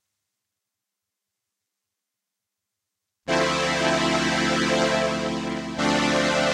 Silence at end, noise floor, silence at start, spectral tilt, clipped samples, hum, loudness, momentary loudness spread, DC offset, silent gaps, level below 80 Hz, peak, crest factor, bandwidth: 0 s; -85 dBFS; 3.25 s; -3.5 dB/octave; under 0.1%; none; -22 LUFS; 6 LU; under 0.1%; none; -50 dBFS; -6 dBFS; 20 dB; 14 kHz